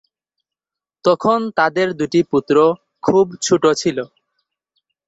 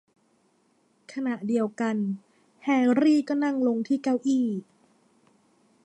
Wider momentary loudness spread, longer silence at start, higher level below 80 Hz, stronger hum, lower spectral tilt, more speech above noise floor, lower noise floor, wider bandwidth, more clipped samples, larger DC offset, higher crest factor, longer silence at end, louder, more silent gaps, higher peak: second, 7 LU vs 12 LU; about the same, 1.05 s vs 1.1 s; first, -58 dBFS vs -80 dBFS; neither; second, -4.5 dB/octave vs -6.5 dB/octave; first, 73 dB vs 42 dB; first, -89 dBFS vs -67 dBFS; about the same, 8.2 kHz vs 9 kHz; neither; neither; about the same, 16 dB vs 16 dB; second, 1 s vs 1.2 s; first, -17 LUFS vs -26 LUFS; neither; first, -2 dBFS vs -10 dBFS